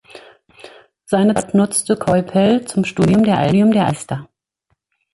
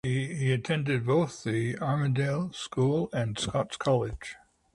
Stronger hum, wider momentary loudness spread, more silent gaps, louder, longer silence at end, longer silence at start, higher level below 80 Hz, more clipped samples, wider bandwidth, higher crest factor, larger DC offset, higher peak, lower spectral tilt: neither; about the same, 7 LU vs 5 LU; neither; first, -16 LUFS vs -29 LUFS; first, 0.9 s vs 0.4 s; about the same, 0.15 s vs 0.05 s; first, -48 dBFS vs -54 dBFS; neither; about the same, 11.5 kHz vs 11.5 kHz; about the same, 14 dB vs 14 dB; neither; first, -2 dBFS vs -14 dBFS; about the same, -6 dB/octave vs -6 dB/octave